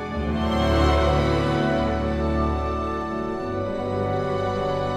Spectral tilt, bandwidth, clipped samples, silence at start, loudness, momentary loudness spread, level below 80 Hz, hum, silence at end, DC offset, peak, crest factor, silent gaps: -7 dB/octave; 10.5 kHz; under 0.1%; 0 s; -23 LUFS; 8 LU; -32 dBFS; none; 0 s; under 0.1%; -6 dBFS; 16 dB; none